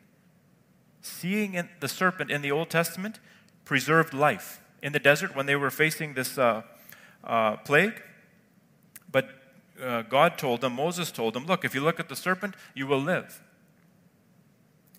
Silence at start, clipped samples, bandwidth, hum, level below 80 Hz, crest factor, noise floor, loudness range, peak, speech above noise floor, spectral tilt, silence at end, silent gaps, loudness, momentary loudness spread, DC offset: 1.05 s; under 0.1%; 16 kHz; none; -78 dBFS; 24 dB; -62 dBFS; 4 LU; -4 dBFS; 35 dB; -4.5 dB/octave; 1.6 s; none; -27 LUFS; 14 LU; under 0.1%